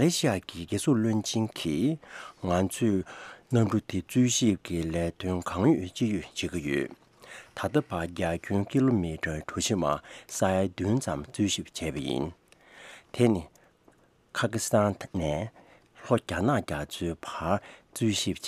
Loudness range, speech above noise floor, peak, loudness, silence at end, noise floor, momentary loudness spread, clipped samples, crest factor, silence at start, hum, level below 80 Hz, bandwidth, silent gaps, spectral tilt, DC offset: 3 LU; 34 dB; -8 dBFS; -29 LUFS; 0 s; -62 dBFS; 11 LU; under 0.1%; 20 dB; 0 s; none; -52 dBFS; 15.5 kHz; none; -5 dB/octave; under 0.1%